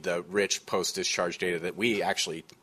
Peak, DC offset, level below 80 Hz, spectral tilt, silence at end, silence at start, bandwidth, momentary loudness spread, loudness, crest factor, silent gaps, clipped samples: -12 dBFS; under 0.1%; -66 dBFS; -2.5 dB/octave; 0.2 s; 0 s; 14 kHz; 3 LU; -29 LUFS; 18 dB; none; under 0.1%